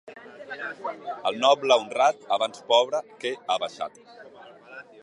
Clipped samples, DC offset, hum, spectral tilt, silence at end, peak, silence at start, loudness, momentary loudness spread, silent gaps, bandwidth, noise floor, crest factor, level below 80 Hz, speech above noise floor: under 0.1%; under 0.1%; none; -2 dB/octave; 0.2 s; -4 dBFS; 0.05 s; -25 LUFS; 23 LU; none; 11 kHz; -48 dBFS; 22 dB; -80 dBFS; 23 dB